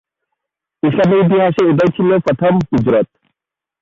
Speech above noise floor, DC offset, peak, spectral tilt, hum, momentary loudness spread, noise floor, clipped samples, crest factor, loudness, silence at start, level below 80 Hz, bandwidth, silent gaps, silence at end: 70 dB; under 0.1%; -4 dBFS; -8.5 dB/octave; none; 5 LU; -82 dBFS; under 0.1%; 12 dB; -13 LUFS; 0.85 s; -46 dBFS; 7.4 kHz; none; 0.75 s